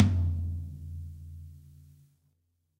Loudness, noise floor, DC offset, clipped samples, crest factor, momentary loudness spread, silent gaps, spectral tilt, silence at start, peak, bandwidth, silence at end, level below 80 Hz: -33 LUFS; -75 dBFS; under 0.1%; under 0.1%; 24 dB; 23 LU; none; -8.5 dB/octave; 0 s; -8 dBFS; 6 kHz; 1.15 s; -44 dBFS